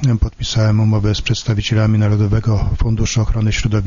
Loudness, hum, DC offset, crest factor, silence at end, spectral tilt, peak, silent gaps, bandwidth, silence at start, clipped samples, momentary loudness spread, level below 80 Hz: -16 LUFS; none; under 0.1%; 12 dB; 0 s; -6 dB/octave; -2 dBFS; none; 7.4 kHz; 0 s; under 0.1%; 4 LU; -24 dBFS